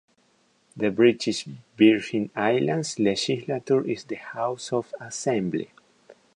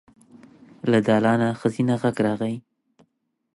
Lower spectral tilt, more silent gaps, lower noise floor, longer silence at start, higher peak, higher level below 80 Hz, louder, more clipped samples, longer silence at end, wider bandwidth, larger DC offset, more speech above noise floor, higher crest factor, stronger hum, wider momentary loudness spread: second, -5 dB/octave vs -7.5 dB/octave; neither; second, -65 dBFS vs -71 dBFS; about the same, 0.75 s vs 0.85 s; about the same, -6 dBFS vs -6 dBFS; about the same, -66 dBFS vs -64 dBFS; second, -25 LUFS vs -22 LUFS; neither; second, 0.25 s vs 0.95 s; about the same, 10.5 kHz vs 11.5 kHz; neither; second, 41 dB vs 50 dB; about the same, 20 dB vs 18 dB; neither; about the same, 12 LU vs 10 LU